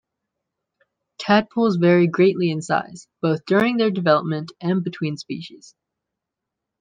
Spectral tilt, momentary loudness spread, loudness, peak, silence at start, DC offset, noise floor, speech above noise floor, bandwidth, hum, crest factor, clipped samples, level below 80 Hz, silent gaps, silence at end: -7 dB/octave; 15 LU; -20 LUFS; -2 dBFS; 1.2 s; under 0.1%; -83 dBFS; 64 dB; 9.4 kHz; none; 18 dB; under 0.1%; -66 dBFS; none; 1.25 s